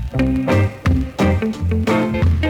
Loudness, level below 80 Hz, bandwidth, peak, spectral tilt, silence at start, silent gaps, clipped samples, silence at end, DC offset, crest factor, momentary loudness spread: -18 LUFS; -28 dBFS; 13 kHz; -6 dBFS; -7.5 dB/octave; 0 s; none; under 0.1%; 0 s; under 0.1%; 12 dB; 3 LU